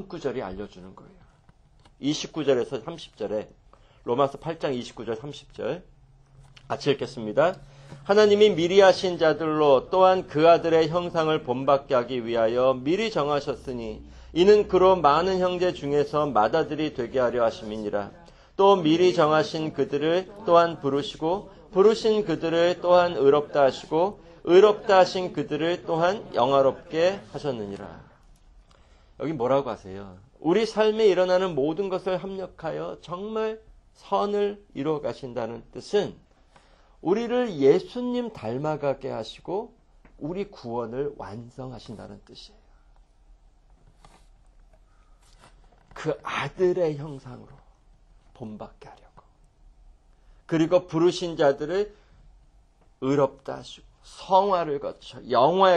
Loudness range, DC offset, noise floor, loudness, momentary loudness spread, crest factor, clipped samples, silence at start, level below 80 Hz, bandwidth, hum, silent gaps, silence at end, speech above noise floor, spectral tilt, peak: 11 LU; under 0.1%; -58 dBFS; -24 LUFS; 18 LU; 20 dB; under 0.1%; 0 s; -54 dBFS; 9.2 kHz; none; none; 0 s; 34 dB; -6 dB/octave; -4 dBFS